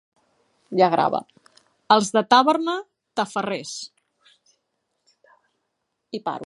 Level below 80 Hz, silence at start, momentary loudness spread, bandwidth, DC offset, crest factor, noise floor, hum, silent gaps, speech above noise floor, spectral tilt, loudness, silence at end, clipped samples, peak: -74 dBFS; 0.7 s; 16 LU; 11.5 kHz; under 0.1%; 22 dB; -77 dBFS; none; none; 56 dB; -4 dB/octave; -21 LUFS; 0.05 s; under 0.1%; -2 dBFS